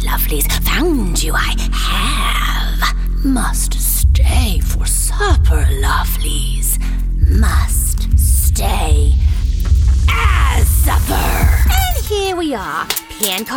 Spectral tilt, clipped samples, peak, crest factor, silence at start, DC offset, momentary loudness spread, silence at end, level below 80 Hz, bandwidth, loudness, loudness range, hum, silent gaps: -4 dB/octave; under 0.1%; 0 dBFS; 12 dB; 0 s; under 0.1%; 5 LU; 0 s; -14 dBFS; 18.5 kHz; -15 LUFS; 2 LU; none; none